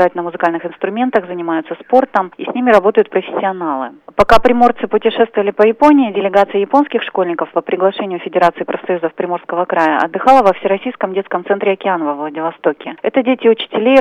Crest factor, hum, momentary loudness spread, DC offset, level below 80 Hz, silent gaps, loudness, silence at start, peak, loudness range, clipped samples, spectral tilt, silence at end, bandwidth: 14 dB; none; 10 LU; under 0.1%; -42 dBFS; none; -14 LUFS; 0 s; 0 dBFS; 4 LU; under 0.1%; -6 dB/octave; 0 s; 11.5 kHz